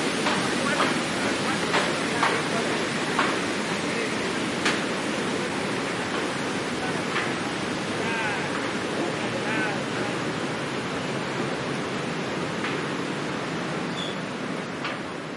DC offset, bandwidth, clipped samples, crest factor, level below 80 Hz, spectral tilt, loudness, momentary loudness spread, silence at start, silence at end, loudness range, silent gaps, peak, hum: under 0.1%; 11.5 kHz; under 0.1%; 18 dB; -60 dBFS; -4 dB/octave; -26 LUFS; 6 LU; 0 s; 0 s; 4 LU; none; -8 dBFS; none